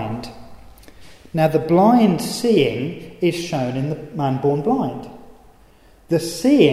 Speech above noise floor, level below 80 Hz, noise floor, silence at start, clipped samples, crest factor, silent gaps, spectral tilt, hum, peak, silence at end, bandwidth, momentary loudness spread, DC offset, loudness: 32 dB; -50 dBFS; -50 dBFS; 0 s; under 0.1%; 18 dB; none; -6.5 dB/octave; none; 0 dBFS; 0 s; 15.5 kHz; 14 LU; under 0.1%; -19 LUFS